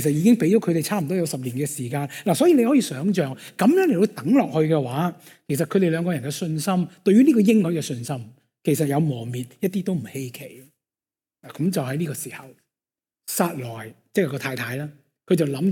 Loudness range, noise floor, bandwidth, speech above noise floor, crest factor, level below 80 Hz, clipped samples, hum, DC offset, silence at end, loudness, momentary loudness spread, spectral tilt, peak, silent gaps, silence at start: 8 LU; under -90 dBFS; 17.5 kHz; over 69 dB; 16 dB; -66 dBFS; under 0.1%; none; under 0.1%; 0 s; -22 LUFS; 15 LU; -6 dB/octave; -6 dBFS; none; 0 s